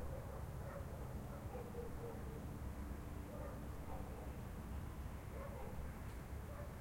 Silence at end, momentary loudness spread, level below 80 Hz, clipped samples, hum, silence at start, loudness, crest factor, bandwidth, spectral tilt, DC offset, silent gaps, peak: 0 s; 1 LU; -52 dBFS; under 0.1%; none; 0 s; -50 LUFS; 12 dB; 16.5 kHz; -7 dB/octave; under 0.1%; none; -34 dBFS